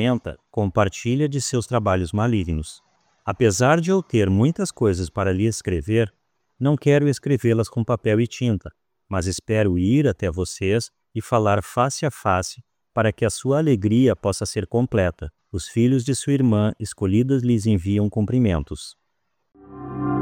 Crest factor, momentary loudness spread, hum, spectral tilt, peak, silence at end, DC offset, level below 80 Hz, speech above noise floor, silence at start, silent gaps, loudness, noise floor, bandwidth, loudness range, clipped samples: 16 dB; 10 LU; none; -6.5 dB/octave; -4 dBFS; 0 s; under 0.1%; -44 dBFS; 55 dB; 0 s; none; -21 LUFS; -76 dBFS; 16.5 kHz; 2 LU; under 0.1%